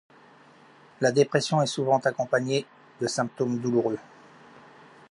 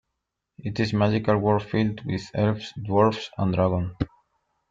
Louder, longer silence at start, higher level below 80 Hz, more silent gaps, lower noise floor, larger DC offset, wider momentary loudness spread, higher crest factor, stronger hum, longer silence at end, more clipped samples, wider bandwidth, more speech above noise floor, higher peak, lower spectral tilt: about the same, -26 LUFS vs -25 LUFS; first, 1 s vs 0.65 s; second, -74 dBFS vs -50 dBFS; neither; second, -54 dBFS vs -82 dBFS; neither; second, 8 LU vs 11 LU; about the same, 20 dB vs 18 dB; neither; first, 1.1 s vs 0.65 s; neither; first, 11.5 kHz vs 7.6 kHz; second, 29 dB vs 58 dB; about the same, -6 dBFS vs -6 dBFS; second, -5 dB/octave vs -7.5 dB/octave